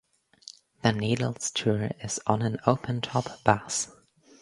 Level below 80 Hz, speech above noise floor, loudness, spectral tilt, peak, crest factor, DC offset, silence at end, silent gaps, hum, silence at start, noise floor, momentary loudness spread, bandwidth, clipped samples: -58 dBFS; 24 dB; -28 LUFS; -4.5 dB/octave; -2 dBFS; 26 dB; under 0.1%; 0.5 s; none; none; 0.85 s; -51 dBFS; 14 LU; 11.5 kHz; under 0.1%